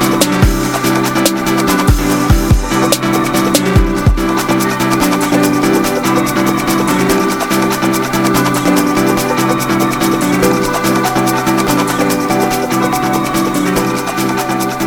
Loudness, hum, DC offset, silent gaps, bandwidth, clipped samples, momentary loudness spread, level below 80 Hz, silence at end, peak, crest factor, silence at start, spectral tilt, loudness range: -12 LUFS; none; under 0.1%; none; over 20 kHz; under 0.1%; 2 LU; -24 dBFS; 0 s; 0 dBFS; 12 dB; 0 s; -4.5 dB/octave; 1 LU